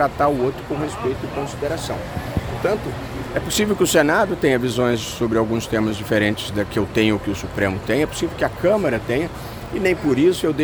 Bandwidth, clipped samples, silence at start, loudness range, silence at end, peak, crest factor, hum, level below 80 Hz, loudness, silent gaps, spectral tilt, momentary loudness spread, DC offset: over 20 kHz; under 0.1%; 0 s; 4 LU; 0 s; -4 dBFS; 18 dB; none; -40 dBFS; -21 LUFS; none; -5 dB/octave; 9 LU; under 0.1%